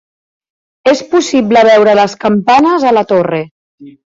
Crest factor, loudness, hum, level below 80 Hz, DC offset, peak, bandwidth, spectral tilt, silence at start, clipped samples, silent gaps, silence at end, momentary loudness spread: 10 dB; -10 LUFS; none; -52 dBFS; under 0.1%; 0 dBFS; 7.8 kHz; -5 dB/octave; 0.85 s; under 0.1%; 3.51-3.78 s; 0.15 s; 9 LU